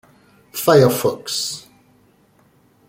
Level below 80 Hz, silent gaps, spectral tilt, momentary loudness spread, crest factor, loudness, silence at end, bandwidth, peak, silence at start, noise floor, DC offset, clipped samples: -60 dBFS; none; -4.5 dB/octave; 17 LU; 18 dB; -17 LUFS; 1.3 s; 17 kHz; -2 dBFS; 0.55 s; -56 dBFS; under 0.1%; under 0.1%